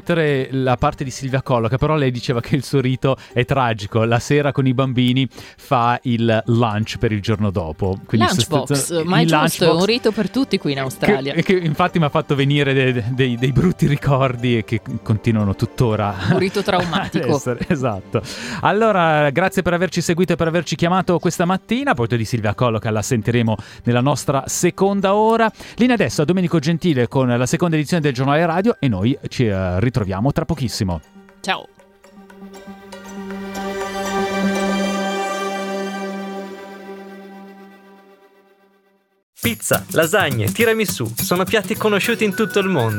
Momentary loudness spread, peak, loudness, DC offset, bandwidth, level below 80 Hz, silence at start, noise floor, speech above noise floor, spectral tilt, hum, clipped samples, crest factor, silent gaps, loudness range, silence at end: 9 LU; -2 dBFS; -18 LUFS; under 0.1%; 17.5 kHz; -44 dBFS; 0.05 s; -60 dBFS; 42 dB; -5.5 dB/octave; none; under 0.1%; 18 dB; 39.23-39.33 s; 8 LU; 0 s